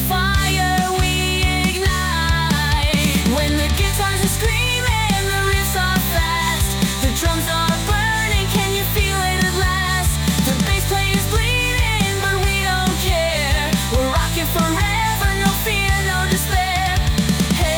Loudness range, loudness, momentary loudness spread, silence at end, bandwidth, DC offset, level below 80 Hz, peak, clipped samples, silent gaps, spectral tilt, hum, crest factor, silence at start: 1 LU; -17 LUFS; 1 LU; 0 s; over 20 kHz; under 0.1%; -24 dBFS; -6 dBFS; under 0.1%; none; -4 dB/octave; none; 12 dB; 0 s